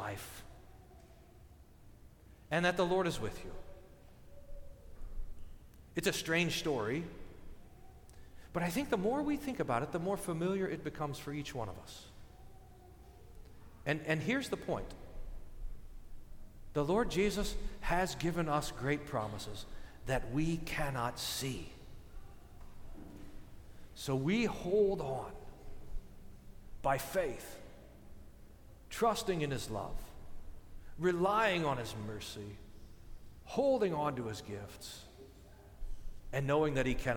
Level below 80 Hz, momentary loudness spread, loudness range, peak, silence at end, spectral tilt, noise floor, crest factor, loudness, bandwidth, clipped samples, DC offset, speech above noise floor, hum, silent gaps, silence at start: -50 dBFS; 25 LU; 6 LU; -18 dBFS; 0 s; -5 dB/octave; -58 dBFS; 20 dB; -36 LUFS; 19 kHz; under 0.1%; under 0.1%; 23 dB; none; none; 0 s